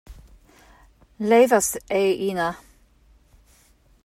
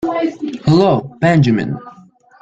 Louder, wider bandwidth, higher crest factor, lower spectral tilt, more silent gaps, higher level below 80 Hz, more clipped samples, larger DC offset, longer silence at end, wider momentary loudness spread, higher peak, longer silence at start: second, -21 LUFS vs -15 LUFS; first, 16 kHz vs 8 kHz; about the same, 18 dB vs 14 dB; second, -4 dB/octave vs -8 dB/octave; neither; second, -54 dBFS vs -48 dBFS; neither; neither; first, 1.5 s vs 0.5 s; first, 13 LU vs 10 LU; second, -6 dBFS vs -2 dBFS; about the same, 0.1 s vs 0 s